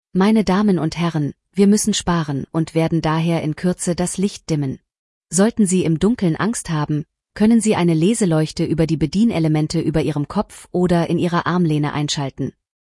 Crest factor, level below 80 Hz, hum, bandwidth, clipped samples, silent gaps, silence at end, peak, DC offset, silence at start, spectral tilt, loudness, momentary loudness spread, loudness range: 14 dB; -44 dBFS; none; 12 kHz; under 0.1%; 4.99-5.21 s; 0.45 s; -4 dBFS; under 0.1%; 0.15 s; -6 dB/octave; -19 LUFS; 8 LU; 3 LU